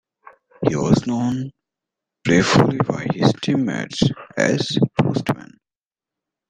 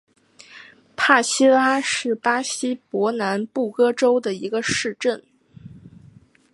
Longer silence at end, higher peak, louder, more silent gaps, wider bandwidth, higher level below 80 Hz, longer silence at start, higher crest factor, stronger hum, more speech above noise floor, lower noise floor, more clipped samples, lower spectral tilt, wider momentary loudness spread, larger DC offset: first, 1.05 s vs 0.65 s; about the same, -2 dBFS vs -2 dBFS; about the same, -20 LUFS vs -20 LUFS; neither; about the same, 11 kHz vs 11.5 kHz; first, -50 dBFS vs -62 dBFS; about the same, 0.6 s vs 0.55 s; about the same, 18 dB vs 20 dB; neither; first, over 72 dB vs 31 dB; first, under -90 dBFS vs -51 dBFS; neither; first, -6 dB/octave vs -3 dB/octave; about the same, 9 LU vs 10 LU; neither